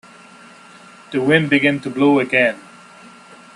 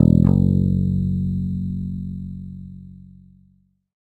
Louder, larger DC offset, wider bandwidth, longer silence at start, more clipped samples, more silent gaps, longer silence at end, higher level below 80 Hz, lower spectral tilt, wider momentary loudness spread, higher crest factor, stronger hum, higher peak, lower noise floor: first, -16 LUFS vs -21 LUFS; neither; first, 11 kHz vs 4.3 kHz; first, 1.1 s vs 0 s; neither; neither; about the same, 0.95 s vs 1.05 s; second, -62 dBFS vs -36 dBFS; second, -6.5 dB/octave vs -12 dB/octave; second, 9 LU vs 21 LU; about the same, 20 dB vs 20 dB; neither; about the same, 0 dBFS vs 0 dBFS; second, -43 dBFS vs -59 dBFS